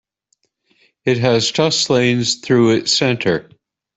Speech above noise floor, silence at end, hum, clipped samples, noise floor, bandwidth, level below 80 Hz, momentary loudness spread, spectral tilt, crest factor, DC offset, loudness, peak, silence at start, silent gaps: 51 dB; 0.55 s; none; under 0.1%; -67 dBFS; 8.4 kHz; -54 dBFS; 6 LU; -4 dB/octave; 14 dB; under 0.1%; -16 LUFS; -2 dBFS; 1.05 s; none